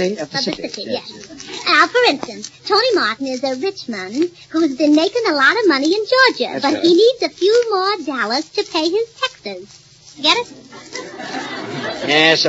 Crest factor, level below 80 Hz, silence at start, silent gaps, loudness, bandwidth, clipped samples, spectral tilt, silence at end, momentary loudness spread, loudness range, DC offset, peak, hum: 18 dB; -62 dBFS; 0 s; none; -16 LUFS; 8 kHz; under 0.1%; -3 dB/octave; 0 s; 16 LU; 6 LU; under 0.1%; 0 dBFS; none